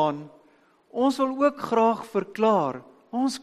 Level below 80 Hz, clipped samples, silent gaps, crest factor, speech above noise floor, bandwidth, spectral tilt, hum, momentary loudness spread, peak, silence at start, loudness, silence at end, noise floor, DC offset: -72 dBFS; under 0.1%; none; 16 dB; 36 dB; 13 kHz; -5.5 dB/octave; none; 13 LU; -10 dBFS; 0 s; -24 LUFS; 0.05 s; -60 dBFS; under 0.1%